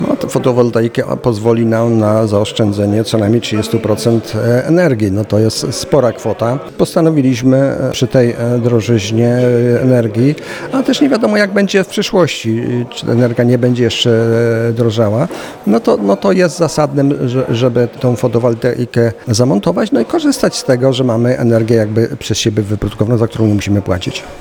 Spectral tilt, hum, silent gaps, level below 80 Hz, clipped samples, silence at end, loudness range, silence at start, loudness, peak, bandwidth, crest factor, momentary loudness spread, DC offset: -6 dB/octave; none; none; -44 dBFS; under 0.1%; 0 s; 1 LU; 0 s; -13 LUFS; 0 dBFS; 18 kHz; 12 dB; 5 LU; under 0.1%